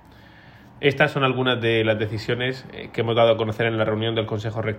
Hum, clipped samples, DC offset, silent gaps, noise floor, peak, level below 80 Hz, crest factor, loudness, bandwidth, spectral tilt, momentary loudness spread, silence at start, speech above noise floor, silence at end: none; under 0.1%; under 0.1%; none; -47 dBFS; -4 dBFS; -54 dBFS; 18 dB; -22 LUFS; 9.8 kHz; -7 dB/octave; 8 LU; 0.45 s; 26 dB; 0 s